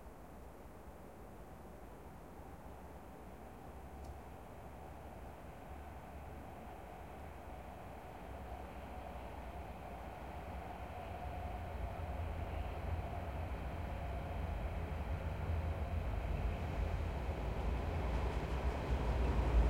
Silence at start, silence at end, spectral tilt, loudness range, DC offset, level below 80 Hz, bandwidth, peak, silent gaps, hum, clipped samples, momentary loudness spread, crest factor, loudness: 0 s; 0 s; -7.5 dB/octave; 13 LU; under 0.1%; -44 dBFS; 16 kHz; -22 dBFS; none; none; under 0.1%; 14 LU; 20 dB; -44 LUFS